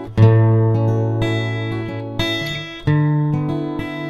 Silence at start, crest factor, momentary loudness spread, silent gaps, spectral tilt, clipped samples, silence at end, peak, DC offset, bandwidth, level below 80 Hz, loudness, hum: 0 s; 18 dB; 11 LU; none; -7.5 dB/octave; under 0.1%; 0 s; 0 dBFS; under 0.1%; 11.5 kHz; -40 dBFS; -18 LUFS; none